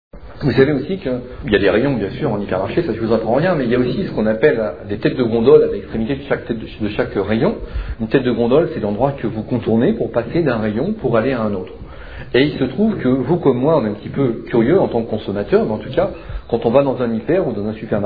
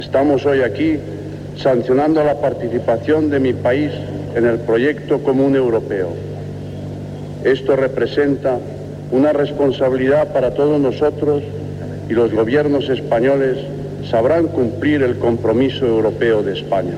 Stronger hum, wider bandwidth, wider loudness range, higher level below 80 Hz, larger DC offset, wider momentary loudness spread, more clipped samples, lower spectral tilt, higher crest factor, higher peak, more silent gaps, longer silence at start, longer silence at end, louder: neither; second, 5 kHz vs 10.5 kHz; about the same, 2 LU vs 2 LU; first, -38 dBFS vs -44 dBFS; first, 0.6% vs under 0.1%; second, 8 LU vs 12 LU; neither; first, -10.5 dB/octave vs -8 dB/octave; about the same, 16 dB vs 14 dB; first, 0 dBFS vs -4 dBFS; neither; first, 0.15 s vs 0 s; about the same, 0 s vs 0 s; about the same, -17 LUFS vs -17 LUFS